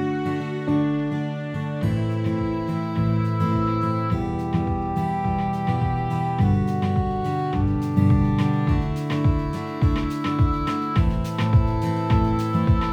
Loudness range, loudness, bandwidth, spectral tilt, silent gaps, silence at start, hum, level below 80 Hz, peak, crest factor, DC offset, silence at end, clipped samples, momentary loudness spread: 2 LU; -23 LUFS; 9.8 kHz; -8.5 dB/octave; none; 0 s; none; -32 dBFS; -6 dBFS; 16 dB; under 0.1%; 0 s; under 0.1%; 5 LU